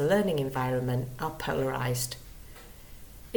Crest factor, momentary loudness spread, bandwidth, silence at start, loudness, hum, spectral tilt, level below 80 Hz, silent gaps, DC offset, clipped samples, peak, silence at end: 18 dB; 22 LU; 19 kHz; 0 s; -30 LUFS; none; -5.5 dB/octave; -50 dBFS; none; under 0.1%; under 0.1%; -12 dBFS; 0 s